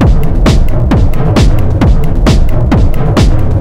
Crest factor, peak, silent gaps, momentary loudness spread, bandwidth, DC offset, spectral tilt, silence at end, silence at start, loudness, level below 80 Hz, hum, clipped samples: 6 dB; 0 dBFS; none; 1 LU; 12 kHz; 2%; -7 dB/octave; 0 s; 0 s; -10 LUFS; -8 dBFS; none; 0.5%